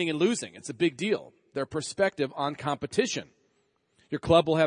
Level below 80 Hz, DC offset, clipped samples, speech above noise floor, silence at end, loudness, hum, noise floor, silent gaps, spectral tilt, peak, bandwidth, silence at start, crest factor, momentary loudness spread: -60 dBFS; under 0.1%; under 0.1%; 44 dB; 0 s; -29 LUFS; none; -71 dBFS; none; -4.5 dB/octave; -6 dBFS; 10.5 kHz; 0 s; 22 dB; 12 LU